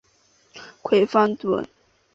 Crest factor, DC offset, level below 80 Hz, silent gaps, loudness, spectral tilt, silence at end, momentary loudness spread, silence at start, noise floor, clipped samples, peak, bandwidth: 18 dB; under 0.1%; -64 dBFS; none; -21 LUFS; -6.5 dB/octave; 0.5 s; 23 LU; 0.55 s; -61 dBFS; under 0.1%; -6 dBFS; 7.6 kHz